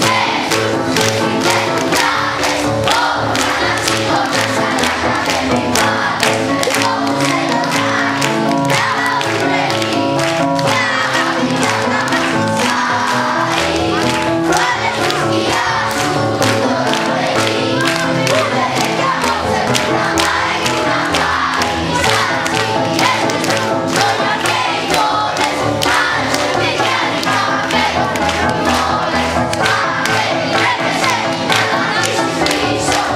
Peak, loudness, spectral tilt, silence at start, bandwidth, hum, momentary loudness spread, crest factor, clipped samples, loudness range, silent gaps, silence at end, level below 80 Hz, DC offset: 0 dBFS; -14 LUFS; -3.5 dB/octave; 0 s; 16.5 kHz; none; 2 LU; 14 dB; under 0.1%; 0 LU; none; 0 s; -42 dBFS; under 0.1%